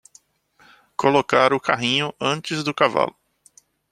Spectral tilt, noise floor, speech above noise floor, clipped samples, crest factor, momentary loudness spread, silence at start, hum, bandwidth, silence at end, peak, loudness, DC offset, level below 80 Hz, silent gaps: -4.5 dB/octave; -58 dBFS; 38 dB; under 0.1%; 20 dB; 7 LU; 1 s; none; 13 kHz; 0.8 s; -2 dBFS; -20 LUFS; under 0.1%; -64 dBFS; none